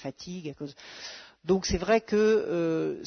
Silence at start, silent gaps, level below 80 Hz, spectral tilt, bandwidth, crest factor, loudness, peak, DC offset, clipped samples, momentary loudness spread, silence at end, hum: 0 s; none; -48 dBFS; -5 dB/octave; 6.6 kHz; 16 dB; -26 LUFS; -12 dBFS; under 0.1%; under 0.1%; 17 LU; 0 s; none